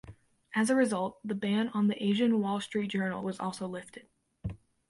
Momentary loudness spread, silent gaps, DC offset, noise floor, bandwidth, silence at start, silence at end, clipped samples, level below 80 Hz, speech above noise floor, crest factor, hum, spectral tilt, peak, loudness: 16 LU; none; under 0.1%; -53 dBFS; 11.5 kHz; 0.05 s; 0.35 s; under 0.1%; -60 dBFS; 23 dB; 16 dB; none; -5.5 dB/octave; -14 dBFS; -31 LUFS